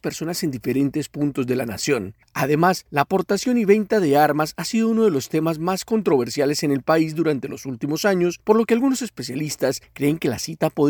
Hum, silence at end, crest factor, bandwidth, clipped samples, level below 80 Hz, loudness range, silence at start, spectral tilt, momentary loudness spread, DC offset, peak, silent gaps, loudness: none; 0 s; 18 dB; 20 kHz; under 0.1%; -58 dBFS; 3 LU; 0.05 s; -5.5 dB/octave; 8 LU; under 0.1%; -2 dBFS; none; -21 LUFS